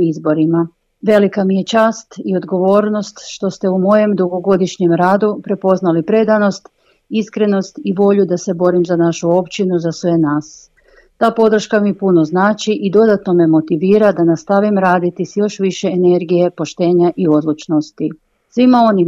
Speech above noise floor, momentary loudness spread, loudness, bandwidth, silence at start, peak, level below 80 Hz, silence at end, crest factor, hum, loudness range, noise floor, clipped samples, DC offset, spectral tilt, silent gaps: 37 dB; 8 LU; -14 LUFS; 8 kHz; 0 s; 0 dBFS; -58 dBFS; 0 s; 14 dB; none; 3 LU; -50 dBFS; under 0.1%; under 0.1%; -7 dB/octave; none